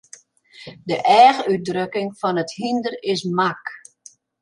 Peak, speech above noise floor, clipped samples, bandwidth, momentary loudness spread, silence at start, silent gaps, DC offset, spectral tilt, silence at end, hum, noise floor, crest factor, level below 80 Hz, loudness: -2 dBFS; 31 dB; under 0.1%; 11 kHz; 21 LU; 0.6 s; none; under 0.1%; -5 dB/octave; 0.65 s; none; -50 dBFS; 18 dB; -68 dBFS; -19 LUFS